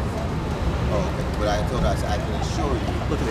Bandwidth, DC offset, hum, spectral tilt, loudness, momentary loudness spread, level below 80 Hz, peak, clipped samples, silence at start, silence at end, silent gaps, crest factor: 15 kHz; under 0.1%; none; -6.5 dB/octave; -24 LUFS; 3 LU; -28 dBFS; -8 dBFS; under 0.1%; 0 s; 0 s; none; 14 dB